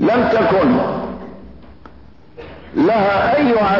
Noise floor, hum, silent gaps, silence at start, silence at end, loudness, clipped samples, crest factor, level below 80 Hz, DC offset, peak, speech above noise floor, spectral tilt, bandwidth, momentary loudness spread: -44 dBFS; none; none; 0 s; 0 s; -15 LUFS; under 0.1%; 10 dB; -44 dBFS; under 0.1%; -6 dBFS; 30 dB; -8 dB/octave; 6 kHz; 21 LU